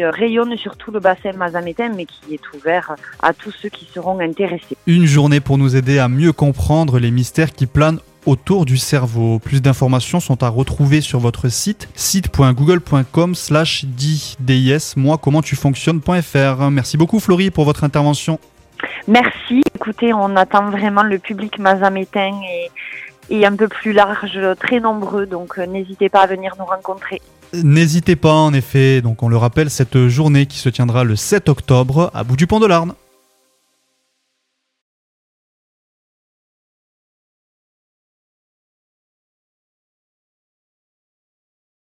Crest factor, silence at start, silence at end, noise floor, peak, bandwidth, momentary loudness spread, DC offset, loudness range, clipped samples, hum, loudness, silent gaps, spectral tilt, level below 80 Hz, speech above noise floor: 16 dB; 0 s; 8.95 s; -72 dBFS; 0 dBFS; 16 kHz; 11 LU; under 0.1%; 5 LU; under 0.1%; none; -15 LUFS; none; -6 dB/octave; -40 dBFS; 57 dB